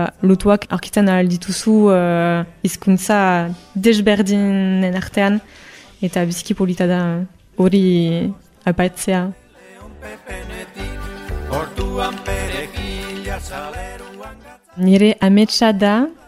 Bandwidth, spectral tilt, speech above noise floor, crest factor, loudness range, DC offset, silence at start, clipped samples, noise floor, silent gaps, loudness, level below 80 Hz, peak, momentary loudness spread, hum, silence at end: 15 kHz; -6 dB/octave; 25 dB; 16 dB; 10 LU; under 0.1%; 0 s; under 0.1%; -41 dBFS; none; -17 LUFS; -36 dBFS; 0 dBFS; 17 LU; none; 0.15 s